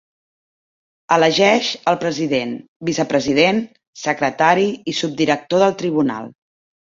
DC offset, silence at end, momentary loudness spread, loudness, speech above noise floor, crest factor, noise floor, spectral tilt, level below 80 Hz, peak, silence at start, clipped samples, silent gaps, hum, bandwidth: under 0.1%; 0.55 s; 10 LU; -18 LUFS; over 73 dB; 18 dB; under -90 dBFS; -4.5 dB/octave; -60 dBFS; -2 dBFS; 1.1 s; under 0.1%; 2.68-2.80 s, 3.87-3.93 s; none; 7.8 kHz